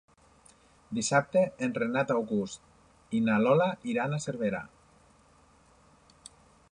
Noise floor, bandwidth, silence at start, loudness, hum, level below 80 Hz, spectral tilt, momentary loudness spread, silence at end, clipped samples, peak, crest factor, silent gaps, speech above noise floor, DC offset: -61 dBFS; 10.5 kHz; 0.9 s; -29 LUFS; none; -66 dBFS; -5.5 dB/octave; 13 LU; 2.05 s; under 0.1%; -12 dBFS; 20 dB; none; 33 dB; under 0.1%